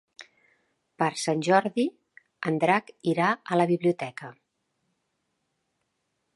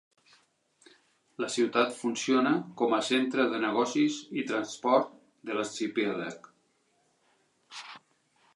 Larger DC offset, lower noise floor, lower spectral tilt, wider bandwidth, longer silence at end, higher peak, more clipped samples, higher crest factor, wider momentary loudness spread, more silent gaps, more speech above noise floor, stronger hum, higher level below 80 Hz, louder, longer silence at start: neither; first, -78 dBFS vs -71 dBFS; first, -5.5 dB/octave vs -4 dB/octave; about the same, 11.5 kHz vs 11.5 kHz; first, 2.05 s vs 0.55 s; first, -6 dBFS vs -10 dBFS; neither; about the same, 22 dB vs 20 dB; second, 11 LU vs 18 LU; neither; first, 53 dB vs 43 dB; neither; first, -78 dBFS vs -84 dBFS; first, -26 LUFS vs -29 LUFS; second, 0.2 s vs 1.4 s